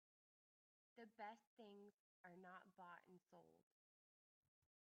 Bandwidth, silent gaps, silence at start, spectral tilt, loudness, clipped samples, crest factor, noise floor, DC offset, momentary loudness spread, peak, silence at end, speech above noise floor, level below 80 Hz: 6.4 kHz; 1.47-1.57 s, 1.94-2.24 s; 0.95 s; -3.5 dB/octave; -63 LUFS; under 0.1%; 22 dB; under -90 dBFS; under 0.1%; 8 LU; -44 dBFS; 1.2 s; over 26 dB; under -90 dBFS